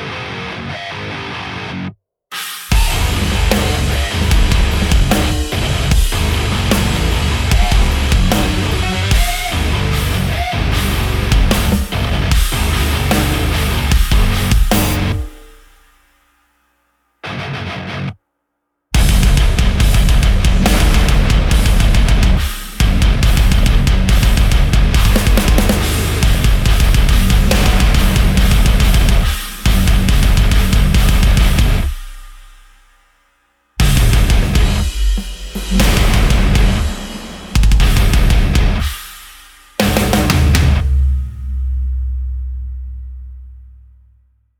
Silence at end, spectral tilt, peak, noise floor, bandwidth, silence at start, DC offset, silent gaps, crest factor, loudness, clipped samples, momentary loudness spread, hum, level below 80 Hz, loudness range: 0.95 s; -5 dB/octave; -2 dBFS; -72 dBFS; 19.5 kHz; 0 s; under 0.1%; none; 10 dB; -15 LUFS; under 0.1%; 11 LU; none; -14 dBFS; 6 LU